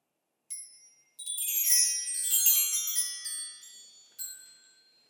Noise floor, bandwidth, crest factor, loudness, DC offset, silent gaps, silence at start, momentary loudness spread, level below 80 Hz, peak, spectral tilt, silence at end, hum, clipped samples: -81 dBFS; over 20 kHz; 22 dB; -25 LUFS; under 0.1%; none; 0.5 s; 19 LU; under -90 dBFS; -10 dBFS; 7.5 dB/octave; 0.6 s; none; under 0.1%